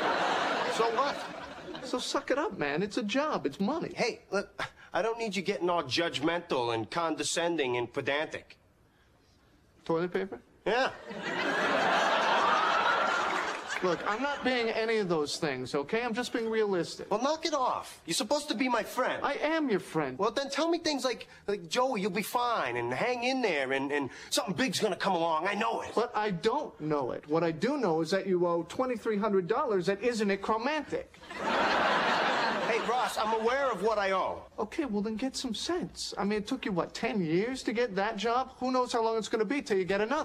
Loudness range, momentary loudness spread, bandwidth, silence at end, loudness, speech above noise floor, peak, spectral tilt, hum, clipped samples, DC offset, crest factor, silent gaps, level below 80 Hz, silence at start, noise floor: 4 LU; 7 LU; 15.5 kHz; 0 s; -30 LUFS; 33 dB; -16 dBFS; -4 dB/octave; none; under 0.1%; under 0.1%; 14 dB; none; -64 dBFS; 0 s; -64 dBFS